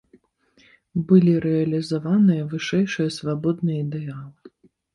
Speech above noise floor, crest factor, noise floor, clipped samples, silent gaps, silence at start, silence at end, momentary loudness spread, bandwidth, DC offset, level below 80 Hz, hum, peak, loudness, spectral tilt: 39 dB; 18 dB; -59 dBFS; under 0.1%; none; 0.95 s; 0.45 s; 13 LU; 11.5 kHz; under 0.1%; -60 dBFS; none; -4 dBFS; -21 LUFS; -7.5 dB/octave